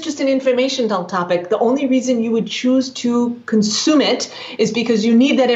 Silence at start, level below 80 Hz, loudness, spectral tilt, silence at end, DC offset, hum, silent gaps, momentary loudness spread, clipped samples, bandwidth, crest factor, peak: 0 s; -70 dBFS; -17 LUFS; -4 dB/octave; 0 s; under 0.1%; none; none; 6 LU; under 0.1%; 8 kHz; 12 dB; -4 dBFS